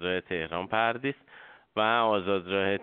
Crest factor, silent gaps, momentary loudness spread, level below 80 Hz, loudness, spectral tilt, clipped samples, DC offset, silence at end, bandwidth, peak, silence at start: 18 dB; none; 10 LU; -66 dBFS; -28 LUFS; -2.5 dB/octave; under 0.1%; under 0.1%; 0 s; 4.6 kHz; -10 dBFS; 0 s